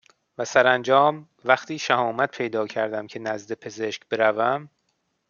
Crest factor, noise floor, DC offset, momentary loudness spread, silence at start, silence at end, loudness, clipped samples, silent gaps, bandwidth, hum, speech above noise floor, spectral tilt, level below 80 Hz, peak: 22 dB; -73 dBFS; under 0.1%; 12 LU; 0.4 s; 0.65 s; -23 LUFS; under 0.1%; none; 7.2 kHz; none; 50 dB; -4 dB/octave; -74 dBFS; -2 dBFS